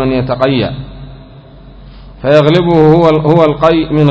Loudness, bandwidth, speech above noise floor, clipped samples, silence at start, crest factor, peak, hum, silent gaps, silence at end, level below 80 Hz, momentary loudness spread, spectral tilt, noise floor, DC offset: -9 LUFS; 8 kHz; 26 dB; 2%; 0 s; 10 dB; 0 dBFS; none; none; 0 s; -34 dBFS; 12 LU; -8.5 dB/octave; -34 dBFS; under 0.1%